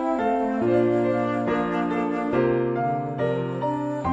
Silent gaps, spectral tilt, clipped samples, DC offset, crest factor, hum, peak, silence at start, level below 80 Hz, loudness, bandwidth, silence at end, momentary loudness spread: none; -8.5 dB/octave; under 0.1%; under 0.1%; 14 dB; none; -10 dBFS; 0 s; -54 dBFS; -24 LUFS; 8 kHz; 0 s; 5 LU